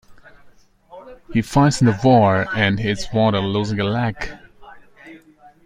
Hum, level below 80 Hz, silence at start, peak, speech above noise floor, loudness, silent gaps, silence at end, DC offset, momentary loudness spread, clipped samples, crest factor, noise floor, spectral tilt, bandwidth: none; -44 dBFS; 0.1 s; -2 dBFS; 32 dB; -18 LUFS; none; 0.5 s; under 0.1%; 10 LU; under 0.1%; 18 dB; -49 dBFS; -6 dB/octave; 14.5 kHz